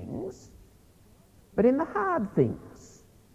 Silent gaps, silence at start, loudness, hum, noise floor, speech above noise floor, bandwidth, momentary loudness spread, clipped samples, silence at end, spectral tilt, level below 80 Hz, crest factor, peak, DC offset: none; 0 s; -27 LUFS; none; -57 dBFS; 31 dB; 14.5 kHz; 17 LU; under 0.1%; 0.5 s; -8.5 dB/octave; -56 dBFS; 20 dB; -10 dBFS; under 0.1%